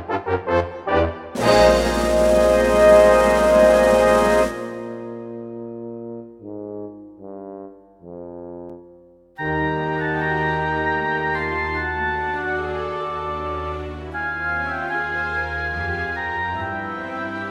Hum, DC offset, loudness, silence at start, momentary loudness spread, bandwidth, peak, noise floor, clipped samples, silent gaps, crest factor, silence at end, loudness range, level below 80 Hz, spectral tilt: none; under 0.1%; -19 LUFS; 0 s; 21 LU; 16 kHz; -2 dBFS; -49 dBFS; under 0.1%; none; 18 dB; 0 s; 19 LU; -36 dBFS; -5 dB/octave